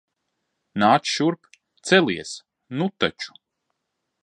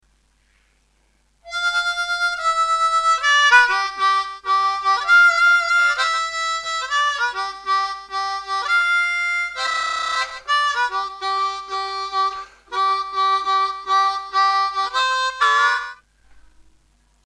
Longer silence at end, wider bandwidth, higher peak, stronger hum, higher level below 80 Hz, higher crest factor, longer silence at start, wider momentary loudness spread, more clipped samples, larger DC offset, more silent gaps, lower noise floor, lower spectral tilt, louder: about the same, 0.95 s vs 0.85 s; about the same, 11 kHz vs 12 kHz; about the same, -2 dBFS vs -2 dBFS; neither; second, -64 dBFS vs -58 dBFS; about the same, 22 dB vs 18 dB; second, 0.75 s vs 1.45 s; first, 17 LU vs 10 LU; neither; neither; neither; first, -79 dBFS vs -62 dBFS; first, -4.5 dB/octave vs 1.5 dB/octave; second, -21 LUFS vs -18 LUFS